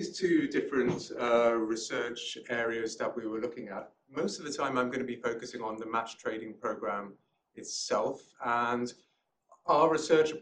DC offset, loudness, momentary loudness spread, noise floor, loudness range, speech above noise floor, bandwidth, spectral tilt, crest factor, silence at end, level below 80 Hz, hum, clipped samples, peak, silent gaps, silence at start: under 0.1%; -32 LUFS; 12 LU; -65 dBFS; 5 LU; 34 dB; 10 kHz; -4 dB/octave; 20 dB; 0 s; -70 dBFS; none; under 0.1%; -12 dBFS; none; 0 s